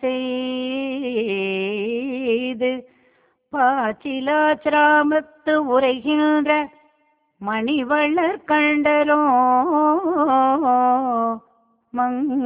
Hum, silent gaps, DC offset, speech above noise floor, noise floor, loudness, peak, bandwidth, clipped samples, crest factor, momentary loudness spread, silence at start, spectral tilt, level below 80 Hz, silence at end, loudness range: none; none; under 0.1%; 46 dB; -64 dBFS; -19 LUFS; -6 dBFS; 4 kHz; under 0.1%; 14 dB; 8 LU; 0 s; -8 dB/octave; -64 dBFS; 0 s; 6 LU